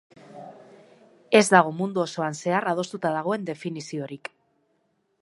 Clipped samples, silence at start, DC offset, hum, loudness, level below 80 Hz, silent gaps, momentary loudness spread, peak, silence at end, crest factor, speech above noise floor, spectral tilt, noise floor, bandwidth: under 0.1%; 0.3 s; under 0.1%; none; -24 LUFS; -76 dBFS; none; 24 LU; -2 dBFS; 1.05 s; 24 dB; 47 dB; -4.5 dB/octave; -71 dBFS; 11.5 kHz